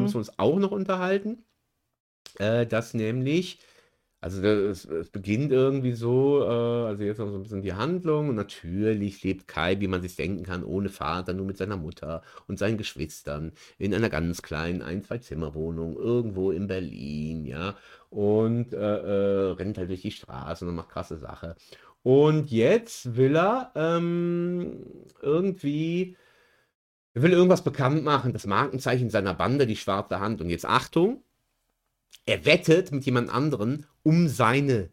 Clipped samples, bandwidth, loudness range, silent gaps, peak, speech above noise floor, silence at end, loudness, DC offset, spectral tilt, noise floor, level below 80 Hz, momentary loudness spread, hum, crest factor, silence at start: under 0.1%; 16 kHz; 7 LU; 2.00-2.25 s, 26.75-27.15 s; -4 dBFS; 51 dB; 0.05 s; -26 LUFS; under 0.1%; -6.5 dB/octave; -77 dBFS; -52 dBFS; 13 LU; none; 22 dB; 0 s